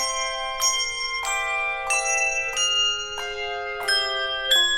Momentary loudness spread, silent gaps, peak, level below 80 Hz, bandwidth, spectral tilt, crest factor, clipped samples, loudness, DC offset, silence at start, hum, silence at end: 9 LU; none; -8 dBFS; -50 dBFS; 17 kHz; 2 dB/octave; 16 dB; under 0.1%; -22 LUFS; under 0.1%; 0 s; none; 0 s